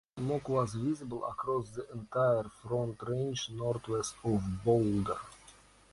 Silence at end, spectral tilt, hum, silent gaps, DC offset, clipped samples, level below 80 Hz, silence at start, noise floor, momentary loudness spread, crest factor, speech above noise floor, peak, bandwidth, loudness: 0.4 s; -6.5 dB/octave; none; none; under 0.1%; under 0.1%; -56 dBFS; 0.15 s; -59 dBFS; 8 LU; 18 dB; 26 dB; -16 dBFS; 11.5 kHz; -34 LUFS